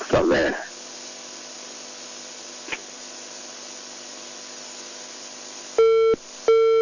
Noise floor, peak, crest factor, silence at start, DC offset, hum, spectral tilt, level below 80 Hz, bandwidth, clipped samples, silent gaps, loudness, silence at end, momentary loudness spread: -38 dBFS; -8 dBFS; 16 dB; 0 s; under 0.1%; 50 Hz at -65 dBFS; -3.5 dB/octave; -52 dBFS; 7.4 kHz; under 0.1%; none; -26 LUFS; 0 s; 17 LU